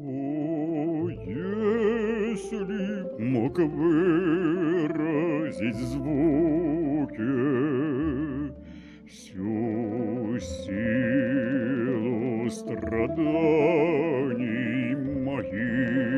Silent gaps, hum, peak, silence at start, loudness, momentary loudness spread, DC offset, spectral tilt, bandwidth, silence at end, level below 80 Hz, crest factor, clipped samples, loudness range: none; none; -10 dBFS; 0 s; -27 LUFS; 9 LU; under 0.1%; -8 dB/octave; 11 kHz; 0 s; -50 dBFS; 16 dB; under 0.1%; 4 LU